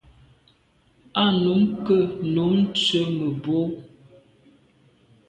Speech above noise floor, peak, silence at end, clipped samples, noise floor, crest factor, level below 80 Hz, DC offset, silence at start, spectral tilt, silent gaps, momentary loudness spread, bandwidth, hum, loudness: 40 dB; -8 dBFS; 1.4 s; under 0.1%; -61 dBFS; 16 dB; -58 dBFS; under 0.1%; 1.15 s; -6.5 dB/octave; none; 7 LU; 9.4 kHz; none; -22 LUFS